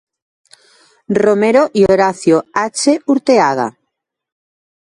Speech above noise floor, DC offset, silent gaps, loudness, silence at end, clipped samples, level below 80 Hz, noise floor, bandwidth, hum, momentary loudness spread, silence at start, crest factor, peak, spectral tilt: 62 dB; under 0.1%; none; -13 LUFS; 1.15 s; under 0.1%; -52 dBFS; -74 dBFS; 11.5 kHz; none; 7 LU; 1.1 s; 14 dB; 0 dBFS; -5 dB/octave